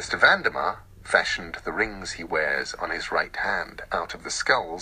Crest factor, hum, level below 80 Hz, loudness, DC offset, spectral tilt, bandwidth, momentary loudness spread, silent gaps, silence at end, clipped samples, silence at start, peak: 22 dB; none; -50 dBFS; -25 LUFS; under 0.1%; -2 dB/octave; 15.5 kHz; 11 LU; none; 0 s; under 0.1%; 0 s; -4 dBFS